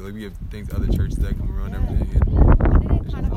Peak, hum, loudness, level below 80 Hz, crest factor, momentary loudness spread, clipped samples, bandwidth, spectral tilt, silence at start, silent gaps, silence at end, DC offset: -2 dBFS; none; -21 LUFS; -20 dBFS; 16 dB; 17 LU; under 0.1%; 9.6 kHz; -9 dB/octave; 0 s; none; 0 s; under 0.1%